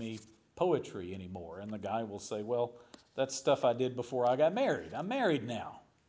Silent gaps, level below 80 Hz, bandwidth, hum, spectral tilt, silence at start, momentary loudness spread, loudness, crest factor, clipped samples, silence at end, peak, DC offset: none; -66 dBFS; 8 kHz; none; -5 dB/octave; 0 s; 14 LU; -34 LUFS; 18 dB; under 0.1%; 0.3 s; -16 dBFS; under 0.1%